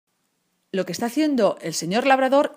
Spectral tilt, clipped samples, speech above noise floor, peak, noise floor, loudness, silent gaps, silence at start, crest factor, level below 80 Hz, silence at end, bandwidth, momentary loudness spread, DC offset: -4.5 dB/octave; under 0.1%; 51 dB; -4 dBFS; -71 dBFS; -21 LUFS; none; 0.75 s; 18 dB; -74 dBFS; 0 s; 15.5 kHz; 10 LU; under 0.1%